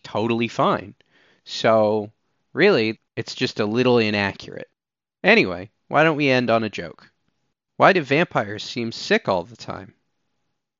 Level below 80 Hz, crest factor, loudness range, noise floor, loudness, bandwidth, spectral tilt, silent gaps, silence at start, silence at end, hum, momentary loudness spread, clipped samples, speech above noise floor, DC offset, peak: -68 dBFS; 20 dB; 3 LU; under -90 dBFS; -20 LUFS; 7.6 kHz; -3.5 dB/octave; none; 0.05 s; 0.95 s; none; 18 LU; under 0.1%; over 70 dB; under 0.1%; -2 dBFS